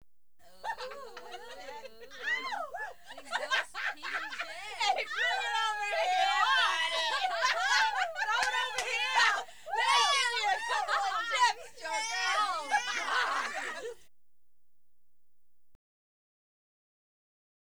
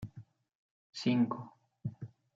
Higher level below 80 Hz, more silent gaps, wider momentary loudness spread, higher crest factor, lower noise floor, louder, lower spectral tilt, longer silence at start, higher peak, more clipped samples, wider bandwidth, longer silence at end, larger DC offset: about the same, -72 dBFS vs -72 dBFS; second, none vs 0.55-0.93 s; second, 17 LU vs 21 LU; about the same, 20 dB vs 18 dB; first, -83 dBFS vs -54 dBFS; first, -30 LUFS vs -35 LUFS; second, 1.5 dB/octave vs -6.5 dB/octave; first, 0.65 s vs 0 s; first, -12 dBFS vs -18 dBFS; neither; first, over 20 kHz vs 7.8 kHz; first, 3.8 s vs 0.3 s; first, 0.3% vs under 0.1%